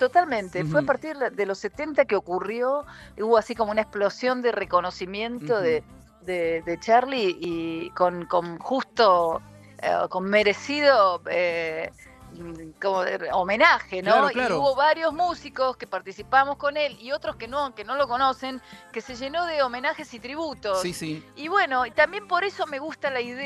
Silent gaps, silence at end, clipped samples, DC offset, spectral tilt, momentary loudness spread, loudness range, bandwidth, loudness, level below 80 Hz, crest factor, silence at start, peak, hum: none; 0 s; under 0.1%; under 0.1%; -4.5 dB/octave; 13 LU; 5 LU; 13 kHz; -24 LUFS; -58 dBFS; 22 dB; 0 s; -2 dBFS; none